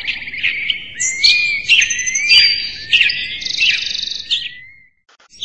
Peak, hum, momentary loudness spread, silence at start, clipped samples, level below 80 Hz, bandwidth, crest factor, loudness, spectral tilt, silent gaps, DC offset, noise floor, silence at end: 0 dBFS; none; 11 LU; 0 s; under 0.1%; -50 dBFS; 11 kHz; 16 dB; -13 LUFS; 2.5 dB/octave; none; 0.9%; -41 dBFS; 0 s